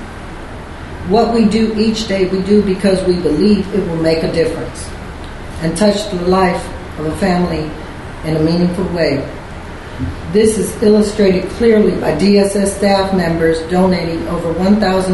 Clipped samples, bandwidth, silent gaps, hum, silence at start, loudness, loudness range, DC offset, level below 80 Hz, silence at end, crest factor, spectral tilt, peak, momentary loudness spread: under 0.1%; 12 kHz; none; none; 0 s; -14 LUFS; 5 LU; under 0.1%; -32 dBFS; 0 s; 14 dB; -6 dB/octave; 0 dBFS; 17 LU